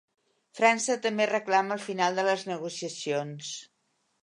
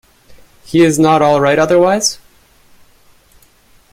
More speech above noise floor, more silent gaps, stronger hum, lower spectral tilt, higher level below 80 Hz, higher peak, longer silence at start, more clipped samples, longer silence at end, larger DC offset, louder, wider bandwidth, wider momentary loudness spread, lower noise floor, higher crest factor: first, 47 dB vs 38 dB; neither; neither; second, -3 dB/octave vs -4.5 dB/octave; second, -84 dBFS vs -50 dBFS; second, -8 dBFS vs 0 dBFS; second, 0.55 s vs 0.7 s; neither; second, 0.55 s vs 1.8 s; neither; second, -28 LUFS vs -11 LUFS; second, 11 kHz vs 16 kHz; first, 12 LU vs 7 LU; first, -75 dBFS vs -49 dBFS; first, 22 dB vs 14 dB